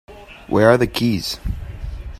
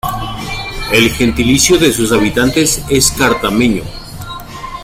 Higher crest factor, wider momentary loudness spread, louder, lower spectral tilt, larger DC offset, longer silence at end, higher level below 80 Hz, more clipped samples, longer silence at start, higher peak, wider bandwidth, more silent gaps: about the same, 18 dB vs 14 dB; about the same, 17 LU vs 17 LU; second, -18 LUFS vs -12 LUFS; first, -6 dB/octave vs -3.5 dB/octave; neither; about the same, 0 s vs 0 s; about the same, -32 dBFS vs -28 dBFS; neither; about the same, 0.1 s vs 0.05 s; about the same, 0 dBFS vs 0 dBFS; about the same, 15.5 kHz vs 16.5 kHz; neither